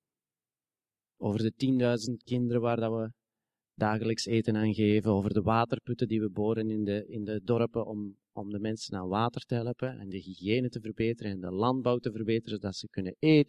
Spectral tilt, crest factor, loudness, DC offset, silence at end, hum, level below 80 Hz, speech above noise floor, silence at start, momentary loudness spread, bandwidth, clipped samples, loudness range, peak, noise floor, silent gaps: -7 dB/octave; 20 dB; -31 LUFS; under 0.1%; 0.05 s; none; -58 dBFS; over 60 dB; 1.2 s; 10 LU; 11 kHz; under 0.1%; 4 LU; -10 dBFS; under -90 dBFS; none